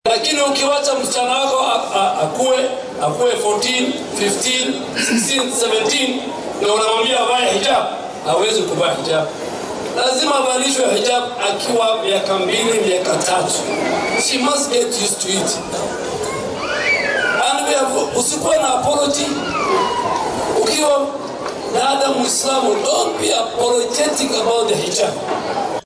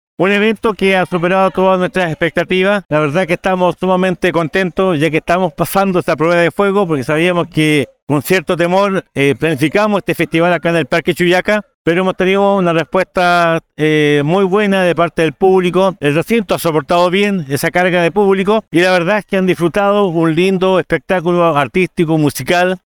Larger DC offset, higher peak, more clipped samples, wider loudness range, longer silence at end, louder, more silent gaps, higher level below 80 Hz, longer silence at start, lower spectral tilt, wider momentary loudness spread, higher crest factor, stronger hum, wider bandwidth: neither; second, -6 dBFS vs 0 dBFS; neither; about the same, 1 LU vs 1 LU; about the same, 0.05 s vs 0.1 s; second, -17 LUFS vs -13 LUFS; second, none vs 2.85-2.89 s, 8.02-8.07 s, 11.74-11.85 s; second, -54 dBFS vs -44 dBFS; second, 0.05 s vs 0.2 s; second, -2 dB/octave vs -6 dB/octave; first, 6 LU vs 3 LU; about the same, 12 dB vs 12 dB; neither; second, 11 kHz vs over 20 kHz